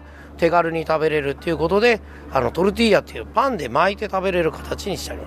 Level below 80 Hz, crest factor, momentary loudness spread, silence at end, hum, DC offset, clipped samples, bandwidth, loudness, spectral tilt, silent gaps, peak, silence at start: -40 dBFS; 16 dB; 7 LU; 0 s; none; under 0.1%; under 0.1%; 15.5 kHz; -20 LUFS; -5.5 dB/octave; none; -4 dBFS; 0 s